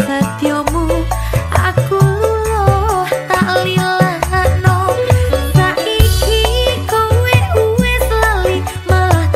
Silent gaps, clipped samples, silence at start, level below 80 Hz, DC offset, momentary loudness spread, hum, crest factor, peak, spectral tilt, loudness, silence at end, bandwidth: none; under 0.1%; 0 s; -22 dBFS; 0.2%; 4 LU; none; 12 dB; 0 dBFS; -5.5 dB/octave; -13 LUFS; 0 s; 16 kHz